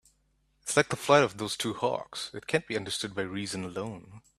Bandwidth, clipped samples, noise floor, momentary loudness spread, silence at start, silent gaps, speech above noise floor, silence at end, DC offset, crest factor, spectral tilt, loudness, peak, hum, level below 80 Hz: 14.5 kHz; under 0.1%; -71 dBFS; 14 LU; 0.65 s; none; 41 dB; 0.2 s; under 0.1%; 24 dB; -3.5 dB/octave; -29 LUFS; -6 dBFS; none; -66 dBFS